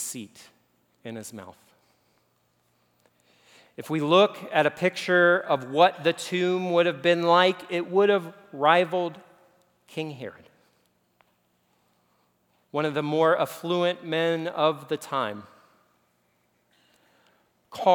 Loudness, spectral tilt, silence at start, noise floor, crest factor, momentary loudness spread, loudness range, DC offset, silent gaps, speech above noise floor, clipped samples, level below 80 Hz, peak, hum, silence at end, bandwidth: -24 LUFS; -4.5 dB/octave; 0 s; -69 dBFS; 22 dB; 20 LU; 16 LU; under 0.1%; none; 45 dB; under 0.1%; -82 dBFS; -4 dBFS; none; 0 s; 20 kHz